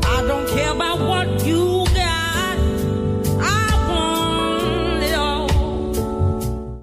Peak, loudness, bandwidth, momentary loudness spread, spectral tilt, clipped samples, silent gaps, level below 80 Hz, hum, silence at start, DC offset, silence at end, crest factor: -6 dBFS; -19 LUFS; 16 kHz; 3 LU; -5 dB/octave; under 0.1%; none; -26 dBFS; none; 0 s; under 0.1%; 0 s; 12 dB